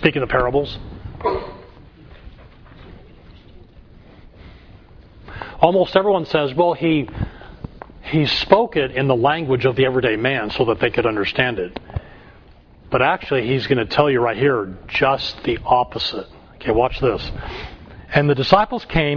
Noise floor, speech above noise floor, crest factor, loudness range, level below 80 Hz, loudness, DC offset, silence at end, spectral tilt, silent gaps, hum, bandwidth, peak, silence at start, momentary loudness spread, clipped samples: -46 dBFS; 28 dB; 20 dB; 7 LU; -40 dBFS; -19 LUFS; under 0.1%; 0 s; -7.5 dB/octave; none; none; 5.4 kHz; 0 dBFS; 0 s; 17 LU; under 0.1%